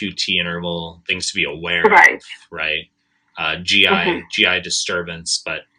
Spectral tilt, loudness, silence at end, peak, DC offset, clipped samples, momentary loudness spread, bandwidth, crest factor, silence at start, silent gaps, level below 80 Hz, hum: -2 dB/octave; -16 LUFS; 0.15 s; 0 dBFS; under 0.1%; under 0.1%; 13 LU; 16 kHz; 18 dB; 0 s; none; -56 dBFS; none